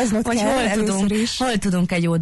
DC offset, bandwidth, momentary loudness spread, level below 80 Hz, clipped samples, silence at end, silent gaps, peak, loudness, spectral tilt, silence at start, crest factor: under 0.1%; 12 kHz; 2 LU; -42 dBFS; under 0.1%; 0 s; none; -10 dBFS; -20 LUFS; -5 dB/octave; 0 s; 10 dB